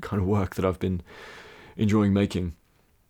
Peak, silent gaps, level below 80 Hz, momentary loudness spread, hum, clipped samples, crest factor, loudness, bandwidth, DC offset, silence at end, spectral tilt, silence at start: -12 dBFS; none; -48 dBFS; 22 LU; none; under 0.1%; 16 dB; -26 LUFS; 17 kHz; under 0.1%; 0.55 s; -7.5 dB/octave; 0 s